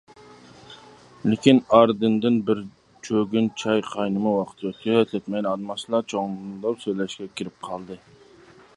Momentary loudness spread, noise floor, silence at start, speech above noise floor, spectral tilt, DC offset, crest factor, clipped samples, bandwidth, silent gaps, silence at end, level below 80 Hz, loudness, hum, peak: 16 LU; -51 dBFS; 0.7 s; 28 dB; -6 dB/octave; under 0.1%; 22 dB; under 0.1%; 11 kHz; none; 0.8 s; -62 dBFS; -23 LUFS; none; 0 dBFS